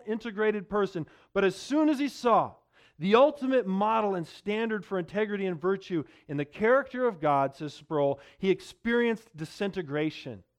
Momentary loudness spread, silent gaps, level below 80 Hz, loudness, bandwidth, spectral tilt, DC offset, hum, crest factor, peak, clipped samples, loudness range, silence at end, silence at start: 10 LU; none; -64 dBFS; -28 LUFS; 13 kHz; -6.5 dB/octave; under 0.1%; none; 20 dB; -8 dBFS; under 0.1%; 3 LU; 0.2 s; 0.05 s